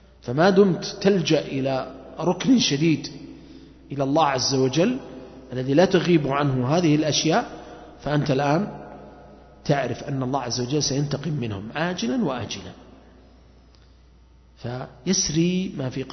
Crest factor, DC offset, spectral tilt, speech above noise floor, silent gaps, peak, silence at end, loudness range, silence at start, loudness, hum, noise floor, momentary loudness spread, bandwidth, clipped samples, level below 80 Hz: 18 dB; under 0.1%; -5 dB/octave; 30 dB; none; -4 dBFS; 0 s; 8 LU; 0.25 s; -22 LUFS; none; -52 dBFS; 17 LU; 6.4 kHz; under 0.1%; -52 dBFS